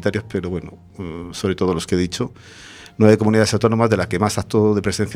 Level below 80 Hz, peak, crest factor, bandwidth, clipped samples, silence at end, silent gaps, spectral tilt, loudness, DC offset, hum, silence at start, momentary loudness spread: -46 dBFS; 0 dBFS; 18 dB; 15.5 kHz; under 0.1%; 0 s; none; -6 dB/octave; -18 LUFS; under 0.1%; none; 0 s; 18 LU